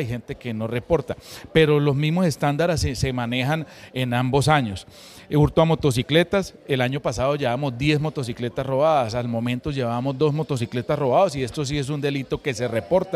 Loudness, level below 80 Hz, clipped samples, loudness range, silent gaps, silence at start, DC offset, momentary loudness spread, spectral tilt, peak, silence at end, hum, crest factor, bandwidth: -22 LUFS; -44 dBFS; under 0.1%; 2 LU; none; 0 s; under 0.1%; 9 LU; -6 dB/octave; -4 dBFS; 0 s; none; 18 dB; 14.5 kHz